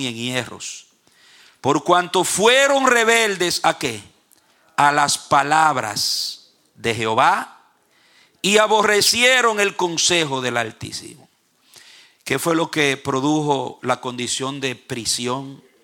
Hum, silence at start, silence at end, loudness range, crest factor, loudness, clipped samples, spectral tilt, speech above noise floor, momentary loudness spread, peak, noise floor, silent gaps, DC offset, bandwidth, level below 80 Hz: none; 0 s; 0.25 s; 5 LU; 20 dB; -18 LUFS; under 0.1%; -2.5 dB/octave; 39 dB; 14 LU; 0 dBFS; -57 dBFS; none; under 0.1%; 18.5 kHz; -60 dBFS